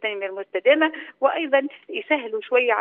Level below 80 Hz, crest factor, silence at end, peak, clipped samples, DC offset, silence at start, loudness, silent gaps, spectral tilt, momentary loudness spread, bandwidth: -82 dBFS; 18 dB; 0 s; -4 dBFS; under 0.1%; under 0.1%; 0 s; -22 LUFS; none; -5 dB/octave; 11 LU; 3.9 kHz